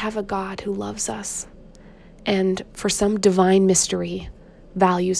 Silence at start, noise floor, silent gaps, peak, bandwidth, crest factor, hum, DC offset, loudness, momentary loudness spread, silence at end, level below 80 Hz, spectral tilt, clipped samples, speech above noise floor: 0 s; -45 dBFS; none; -2 dBFS; 11 kHz; 18 dB; none; under 0.1%; -21 LUFS; 14 LU; 0 s; -46 dBFS; -4.5 dB/octave; under 0.1%; 24 dB